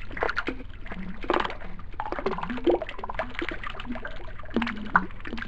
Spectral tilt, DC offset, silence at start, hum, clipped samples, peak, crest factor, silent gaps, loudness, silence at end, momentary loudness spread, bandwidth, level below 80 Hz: -6.5 dB/octave; 1%; 0 s; none; under 0.1%; -4 dBFS; 26 dB; none; -30 LUFS; 0 s; 14 LU; 8 kHz; -38 dBFS